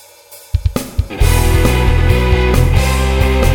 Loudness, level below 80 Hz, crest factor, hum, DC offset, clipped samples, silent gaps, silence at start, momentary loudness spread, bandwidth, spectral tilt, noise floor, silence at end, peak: -14 LUFS; -14 dBFS; 12 dB; none; under 0.1%; under 0.1%; none; 0.3 s; 7 LU; 18 kHz; -5.5 dB/octave; -39 dBFS; 0 s; 0 dBFS